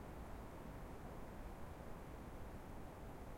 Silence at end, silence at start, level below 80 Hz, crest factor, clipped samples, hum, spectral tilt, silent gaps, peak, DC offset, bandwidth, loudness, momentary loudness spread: 0 s; 0 s; -56 dBFS; 14 dB; under 0.1%; none; -6.5 dB/octave; none; -38 dBFS; under 0.1%; 16.5 kHz; -54 LUFS; 1 LU